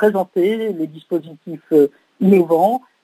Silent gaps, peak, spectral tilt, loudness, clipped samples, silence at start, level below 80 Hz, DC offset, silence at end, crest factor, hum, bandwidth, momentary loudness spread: none; -2 dBFS; -8 dB/octave; -17 LUFS; under 0.1%; 0 s; -72 dBFS; under 0.1%; 0.25 s; 16 dB; none; 16 kHz; 12 LU